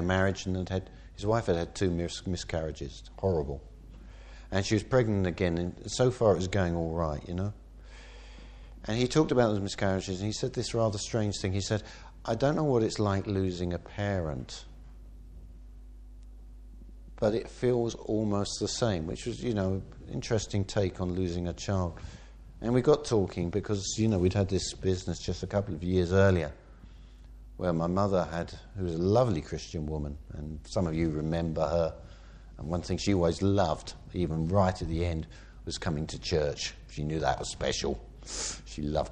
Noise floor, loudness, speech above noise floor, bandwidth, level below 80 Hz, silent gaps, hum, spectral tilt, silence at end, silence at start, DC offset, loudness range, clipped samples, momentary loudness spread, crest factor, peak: -50 dBFS; -30 LUFS; 20 dB; 9.8 kHz; -46 dBFS; none; none; -6 dB/octave; 0 s; 0 s; under 0.1%; 4 LU; under 0.1%; 15 LU; 20 dB; -10 dBFS